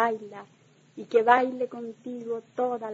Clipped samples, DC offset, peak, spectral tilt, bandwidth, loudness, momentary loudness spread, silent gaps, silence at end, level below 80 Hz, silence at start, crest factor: under 0.1%; under 0.1%; -4 dBFS; -5.5 dB/octave; 7.8 kHz; -26 LUFS; 22 LU; none; 0 s; -82 dBFS; 0 s; 22 dB